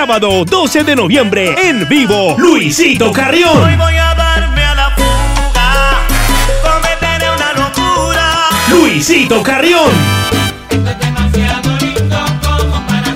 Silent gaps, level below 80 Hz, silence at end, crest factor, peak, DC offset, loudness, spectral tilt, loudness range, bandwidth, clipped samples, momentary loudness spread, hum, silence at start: none; -18 dBFS; 0 s; 10 dB; 0 dBFS; under 0.1%; -10 LUFS; -4.5 dB/octave; 3 LU; 16.5 kHz; 0.2%; 5 LU; none; 0 s